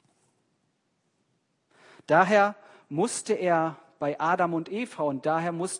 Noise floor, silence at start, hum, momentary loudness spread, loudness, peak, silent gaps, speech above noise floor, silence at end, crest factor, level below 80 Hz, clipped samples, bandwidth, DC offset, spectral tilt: -74 dBFS; 2.1 s; none; 11 LU; -26 LUFS; -8 dBFS; none; 49 dB; 0 s; 20 dB; -80 dBFS; under 0.1%; 11 kHz; under 0.1%; -5 dB/octave